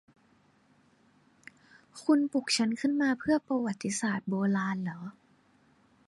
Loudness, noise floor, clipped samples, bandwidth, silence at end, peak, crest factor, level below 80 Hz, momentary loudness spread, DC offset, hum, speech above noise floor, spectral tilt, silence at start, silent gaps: -30 LUFS; -66 dBFS; under 0.1%; 11.5 kHz; 0.95 s; -14 dBFS; 18 dB; -72 dBFS; 10 LU; under 0.1%; 50 Hz at -55 dBFS; 36 dB; -4.5 dB/octave; 1.95 s; none